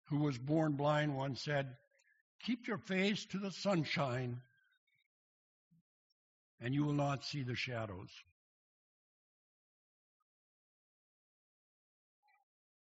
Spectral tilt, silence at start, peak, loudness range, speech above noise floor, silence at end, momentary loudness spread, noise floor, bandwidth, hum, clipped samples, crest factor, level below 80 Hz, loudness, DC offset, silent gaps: -5 dB/octave; 0.1 s; -22 dBFS; 8 LU; over 53 dB; 4.65 s; 12 LU; under -90 dBFS; 7.6 kHz; none; under 0.1%; 20 dB; -76 dBFS; -38 LUFS; under 0.1%; 2.21-2.39 s, 4.77-4.87 s, 5.06-5.71 s, 5.81-6.58 s